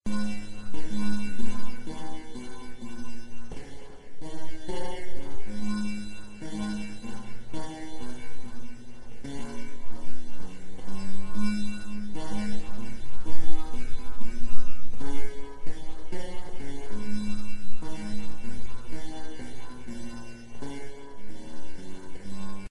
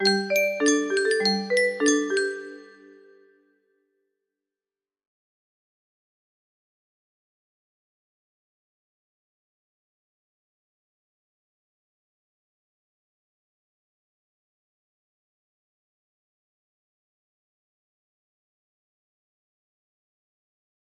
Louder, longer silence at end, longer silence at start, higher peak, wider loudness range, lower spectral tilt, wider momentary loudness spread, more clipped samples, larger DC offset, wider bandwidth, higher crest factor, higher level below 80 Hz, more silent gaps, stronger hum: second, -39 LUFS vs -23 LUFS; second, 0.05 s vs 18.2 s; about the same, 0.05 s vs 0 s; first, -4 dBFS vs -8 dBFS; second, 6 LU vs 11 LU; first, -5.5 dB/octave vs -2.5 dB/octave; first, 12 LU vs 7 LU; neither; neither; second, 11 kHz vs 13 kHz; second, 16 dB vs 24 dB; first, -40 dBFS vs -80 dBFS; neither; neither